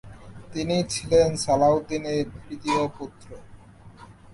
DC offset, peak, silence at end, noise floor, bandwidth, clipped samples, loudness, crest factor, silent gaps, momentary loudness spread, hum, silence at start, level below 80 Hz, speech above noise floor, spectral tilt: under 0.1%; -8 dBFS; 0 s; -47 dBFS; 11.5 kHz; under 0.1%; -24 LUFS; 18 dB; none; 19 LU; none; 0.05 s; -48 dBFS; 23 dB; -5 dB/octave